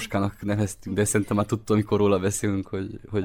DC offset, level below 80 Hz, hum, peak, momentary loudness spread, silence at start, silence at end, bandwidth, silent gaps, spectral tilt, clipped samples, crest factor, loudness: under 0.1%; -50 dBFS; none; -10 dBFS; 8 LU; 0 s; 0 s; 18 kHz; none; -5.5 dB/octave; under 0.1%; 16 dB; -25 LUFS